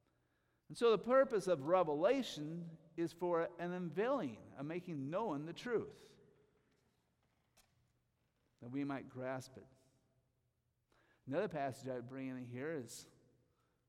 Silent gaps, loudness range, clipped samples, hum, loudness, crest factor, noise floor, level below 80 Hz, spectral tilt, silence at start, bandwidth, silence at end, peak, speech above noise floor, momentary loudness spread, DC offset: none; 13 LU; under 0.1%; none; -40 LUFS; 20 dB; -83 dBFS; -80 dBFS; -6 dB/octave; 0.7 s; 15 kHz; 0.85 s; -20 dBFS; 44 dB; 16 LU; under 0.1%